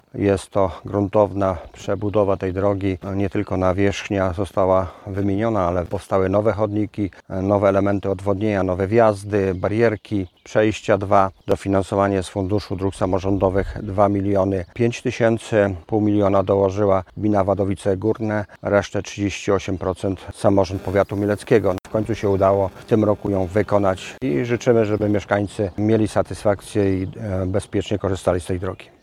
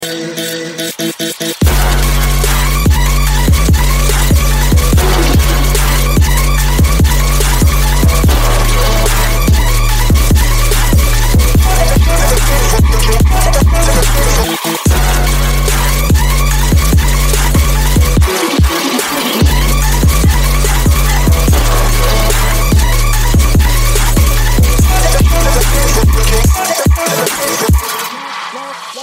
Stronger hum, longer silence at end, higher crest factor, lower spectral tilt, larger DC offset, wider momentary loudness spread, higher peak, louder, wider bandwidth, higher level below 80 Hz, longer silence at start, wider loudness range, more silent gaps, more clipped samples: neither; first, 0.2 s vs 0 s; first, 20 dB vs 10 dB; first, -7 dB/octave vs -4 dB/octave; neither; first, 7 LU vs 3 LU; about the same, 0 dBFS vs 0 dBFS; second, -21 LUFS vs -11 LUFS; second, 12.5 kHz vs 16.5 kHz; second, -44 dBFS vs -12 dBFS; first, 0.15 s vs 0 s; about the same, 2 LU vs 1 LU; neither; neither